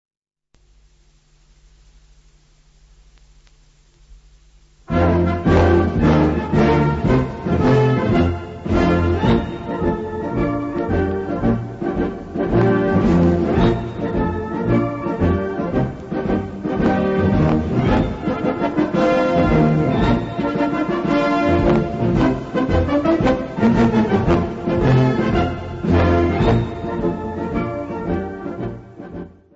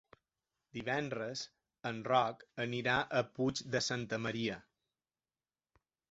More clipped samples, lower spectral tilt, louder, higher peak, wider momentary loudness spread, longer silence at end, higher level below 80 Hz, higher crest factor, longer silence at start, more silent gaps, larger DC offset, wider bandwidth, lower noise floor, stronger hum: neither; first, -8.5 dB/octave vs -3 dB/octave; first, -18 LUFS vs -36 LUFS; first, -2 dBFS vs -18 dBFS; second, 9 LU vs 12 LU; second, 0.25 s vs 1.5 s; first, -32 dBFS vs -70 dBFS; second, 16 dB vs 22 dB; first, 4.1 s vs 0.75 s; neither; neither; about the same, 7.8 kHz vs 8 kHz; second, -59 dBFS vs under -90 dBFS; neither